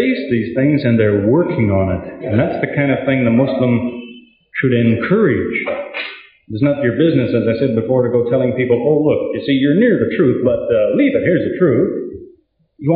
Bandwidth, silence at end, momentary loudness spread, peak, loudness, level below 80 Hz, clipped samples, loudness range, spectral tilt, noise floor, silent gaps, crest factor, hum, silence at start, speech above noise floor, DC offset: 5 kHz; 0 s; 9 LU; -2 dBFS; -15 LUFS; -50 dBFS; under 0.1%; 2 LU; -7 dB/octave; -51 dBFS; none; 12 dB; none; 0 s; 37 dB; under 0.1%